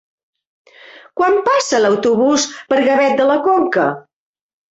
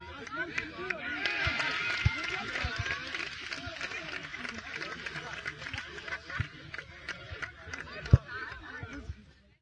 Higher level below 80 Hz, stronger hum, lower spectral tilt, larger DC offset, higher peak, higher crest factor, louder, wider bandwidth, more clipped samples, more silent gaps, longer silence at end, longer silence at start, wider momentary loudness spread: second, -60 dBFS vs -46 dBFS; neither; about the same, -3.5 dB/octave vs -4.5 dB/octave; neither; first, -2 dBFS vs -6 dBFS; second, 14 dB vs 30 dB; first, -14 LUFS vs -35 LUFS; second, 8.2 kHz vs 10 kHz; neither; neither; first, 0.7 s vs 0.3 s; first, 1.15 s vs 0 s; second, 5 LU vs 13 LU